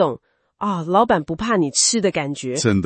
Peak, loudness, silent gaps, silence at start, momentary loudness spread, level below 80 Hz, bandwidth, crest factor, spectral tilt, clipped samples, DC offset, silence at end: -4 dBFS; -19 LUFS; none; 0 s; 9 LU; -50 dBFS; 8.8 kHz; 16 dB; -4 dB/octave; under 0.1%; under 0.1%; 0 s